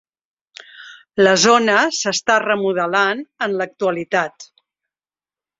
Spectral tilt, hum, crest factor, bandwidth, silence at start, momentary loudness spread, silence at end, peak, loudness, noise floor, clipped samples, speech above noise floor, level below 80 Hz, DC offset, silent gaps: -2.5 dB/octave; none; 18 dB; 8 kHz; 0.8 s; 11 LU; 1.15 s; -2 dBFS; -17 LUFS; under -90 dBFS; under 0.1%; over 73 dB; -64 dBFS; under 0.1%; none